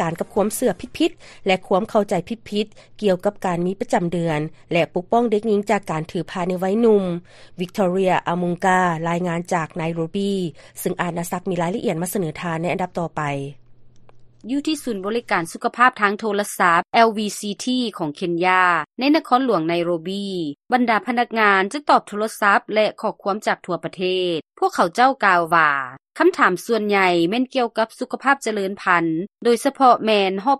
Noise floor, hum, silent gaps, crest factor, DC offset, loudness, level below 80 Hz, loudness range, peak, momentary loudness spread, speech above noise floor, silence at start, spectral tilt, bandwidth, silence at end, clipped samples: -44 dBFS; none; none; 20 dB; under 0.1%; -20 LUFS; -56 dBFS; 6 LU; 0 dBFS; 10 LU; 24 dB; 0 s; -5 dB/octave; 13 kHz; 0 s; under 0.1%